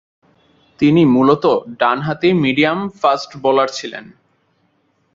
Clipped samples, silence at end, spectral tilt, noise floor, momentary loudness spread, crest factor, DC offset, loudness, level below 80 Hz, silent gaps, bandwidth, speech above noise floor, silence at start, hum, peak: under 0.1%; 1.1 s; -6.5 dB/octave; -62 dBFS; 8 LU; 16 dB; under 0.1%; -15 LUFS; -56 dBFS; none; 7.6 kHz; 47 dB; 0.8 s; none; 0 dBFS